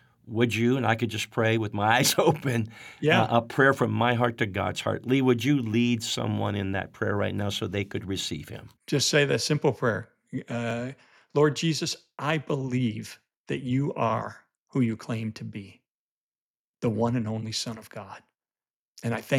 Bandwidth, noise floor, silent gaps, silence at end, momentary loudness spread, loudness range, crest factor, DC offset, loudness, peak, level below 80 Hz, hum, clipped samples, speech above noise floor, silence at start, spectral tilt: 18 kHz; under -90 dBFS; 13.37-13.44 s, 14.58-14.66 s, 15.90-16.32 s, 16.41-16.74 s, 18.70-18.93 s; 0 s; 14 LU; 8 LU; 20 dB; under 0.1%; -26 LUFS; -6 dBFS; -66 dBFS; none; under 0.1%; over 64 dB; 0.25 s; -5 dB/octave